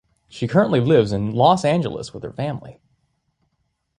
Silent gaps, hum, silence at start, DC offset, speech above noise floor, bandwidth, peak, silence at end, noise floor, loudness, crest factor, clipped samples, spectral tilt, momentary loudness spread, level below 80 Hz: none; none; 0.35 s; under 0.1%; 52 dB; 11 kHz; -2 dBFS; 1.25 s; -71 dBFS; -19 LUFS; 18 dB; under 0.1%; -7 dB/octave; 14 LU; -52 dBFS